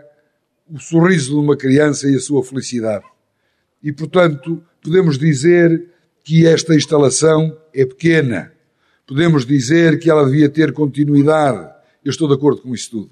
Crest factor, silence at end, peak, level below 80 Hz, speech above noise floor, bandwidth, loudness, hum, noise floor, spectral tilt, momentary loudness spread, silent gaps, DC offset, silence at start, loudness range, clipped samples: 14 dB; 0.05 s; -2 dBFS; -58 dBFS; 52 dB; 11 kHz; -14 LUFS; none; -66 dBFS; -6 dB/octave; 13 LU; none; under 0.1%; 0.7 s; 4 LU; under 0.1%